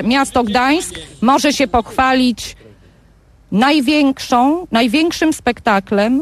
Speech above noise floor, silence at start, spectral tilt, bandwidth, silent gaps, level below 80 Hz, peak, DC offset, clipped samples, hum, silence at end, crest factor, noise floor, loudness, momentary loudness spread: 33 dB; 0 s; -4 dB/octave; 14.5 kHz; none; -40 dBFS; -2 dBFS; under 0.1%; under 0.1%; none; 0 s; 12 dB; -48 dBFS; -14 LUFS; 5 LU